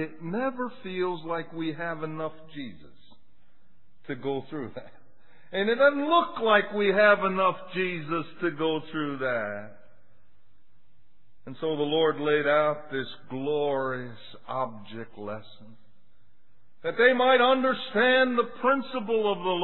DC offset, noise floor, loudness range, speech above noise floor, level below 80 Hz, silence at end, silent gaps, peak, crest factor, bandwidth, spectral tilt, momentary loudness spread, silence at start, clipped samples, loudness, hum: 0.8%; -69 dBFS; 12 LU; 42 dB; -72 dBFS; 0 s; none; -6 dBFS; 20 dB; 4.3 kHz; -8.5 dB/octave; 18 LU; 0 s; under 0.1%; -26 LUFS; none